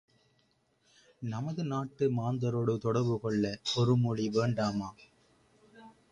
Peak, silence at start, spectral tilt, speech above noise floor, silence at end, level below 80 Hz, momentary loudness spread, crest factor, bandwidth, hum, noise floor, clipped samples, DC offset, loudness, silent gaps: -16 dBFS; 1.2 s; -7 dB/octave; 41 dB; 0.2 s; -64 dBFS; 10 LU; 18 dB; 9.6 kHz; none; -72 dBFS; under 0.1%; under 0.1%; -31 LUFS; none